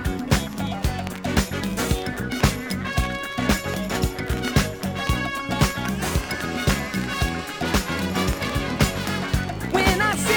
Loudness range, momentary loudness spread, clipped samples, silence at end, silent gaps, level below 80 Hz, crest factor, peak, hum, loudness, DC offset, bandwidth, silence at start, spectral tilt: 1 LU; 4 LU; under 0.1%; 0 s; none; -32 dBFS; 20 dB; -4 dBFS; none; -24 LUFS; under 0.1%; over 20 kHz; 0 s; -4.5 dB/octave